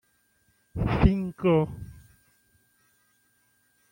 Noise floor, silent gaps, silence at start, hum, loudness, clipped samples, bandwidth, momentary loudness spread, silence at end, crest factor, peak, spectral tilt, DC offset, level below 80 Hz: -68 dBFS; none; 0.75 s; none; -25 LUFS; under 0.1%; 16.5 kHz; 19 LU; 2 s; 24 dB; -4 dBFS; -9 dB/octave; under 0.1%; -38 dBFS